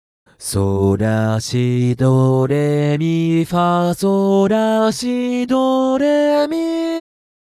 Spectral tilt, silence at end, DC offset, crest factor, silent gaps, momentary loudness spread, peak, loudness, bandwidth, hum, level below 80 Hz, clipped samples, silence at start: -7 dB/octave; 0.5 s; under 0.1%; 10 dB; none; 5 LU; -6 dBFS; -16 LUFS; 14.5 kHz; none; -50 dBFS; under 0.1%; 0.4 s